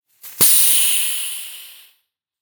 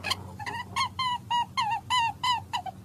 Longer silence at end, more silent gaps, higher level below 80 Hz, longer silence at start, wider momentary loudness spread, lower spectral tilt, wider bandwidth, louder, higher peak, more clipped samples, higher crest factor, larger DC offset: first, 0.7 s vs 0 s; neither; about the same, -64 dBFS vs -60 dBFS; first, 0.25 s vs 0 s; first, 18 LU vs 8 LU; second, 1.5 dB/octave vs -2 dB/octave; first, 19.5 kHz vs 15 kHz; first, -13 LUFS vs -29 LUFS; first, 0 dBFS vs -14 dBFS; neither; about the same, 18 dB vs 18 dB; neither